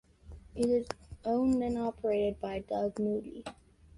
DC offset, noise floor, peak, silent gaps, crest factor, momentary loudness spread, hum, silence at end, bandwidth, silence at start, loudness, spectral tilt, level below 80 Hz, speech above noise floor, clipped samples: under 0.1%; -52 dBFS; -16 dBFS; none; 18 dB; 15 LU; none; 0.45 s; 11.5 kHz; 0.25 s; -33 LUFS; -6.5 dB/octave; -54 dBFS; 20 dB; under 0.1%